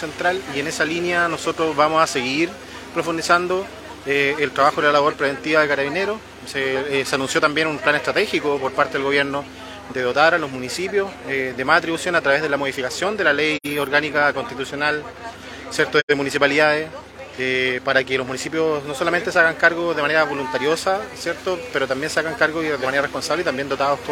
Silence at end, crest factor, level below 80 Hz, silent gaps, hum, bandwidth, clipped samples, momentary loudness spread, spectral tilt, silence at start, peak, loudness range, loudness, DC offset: 0 s; 20 dB; -52 dBFS; 16.03-16.08 s; none; 17 kHz; under 0.1%; 9 LU; -3.5 dB/octave; 0 s; 0 dBFS; 2 LU; -20 LUFS; under 0.1%